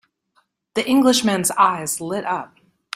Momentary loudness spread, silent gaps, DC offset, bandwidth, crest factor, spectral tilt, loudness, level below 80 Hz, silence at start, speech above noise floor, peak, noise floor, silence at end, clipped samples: 11 LU; none; under 0.1%; 16 kHz; 18 dB; -3 dB/octave; -19 LUFS; -62 dBFS; 0.75 s; 46 dB; -2 dBFS; -65 dBFS; 0.5 s; under 0.1%